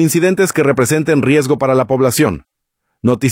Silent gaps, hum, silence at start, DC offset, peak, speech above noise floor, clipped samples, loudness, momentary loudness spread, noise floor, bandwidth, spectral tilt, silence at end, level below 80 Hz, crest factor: none; none; 0 s; under 0.1%; -2 dBFS; 59 dB; under 0.1%; -13 LUFS; 5 LU; -72 dBFS; 17.5 kHz; -5.5 dB/octave; 0 s; -48 dBFS; 12 dB